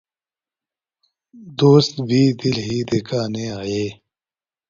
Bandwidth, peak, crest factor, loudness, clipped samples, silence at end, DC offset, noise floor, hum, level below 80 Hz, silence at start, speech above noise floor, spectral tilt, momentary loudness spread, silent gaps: 7.6 kHz; -2 dBFS; 20 dB; -19 LUFS; under 0.1%; 0.75 s; under 0.1%; under -90 dBFS; none; -54 dBFS; 1.35 s; over 72 dB; -6.5 dB/octave; 12 LU; none